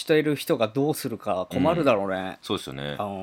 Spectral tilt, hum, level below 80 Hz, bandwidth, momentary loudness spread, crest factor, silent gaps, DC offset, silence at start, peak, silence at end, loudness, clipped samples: -5.5 dB/octave; none; -60 dBFS; 17.5 kHz; 9 LU; 18 dB; none; under 0.1%; 0 s; -8 dBFS; 0 s; -25 LUFS; under 0.1%